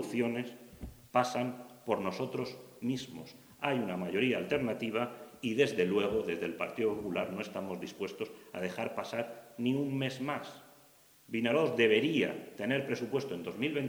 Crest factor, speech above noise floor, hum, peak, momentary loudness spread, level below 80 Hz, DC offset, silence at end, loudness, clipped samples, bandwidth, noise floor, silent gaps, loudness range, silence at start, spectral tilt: 22 dB; 28 dB; none; -12 dBFS; 12 LU; -64 dBFS; under 0.1%; 0 s; -34 LUFS; under 0.1%; over 20 kHz; -62 dBFS; none; 5 LU; 0 s; -5.5 dB/octave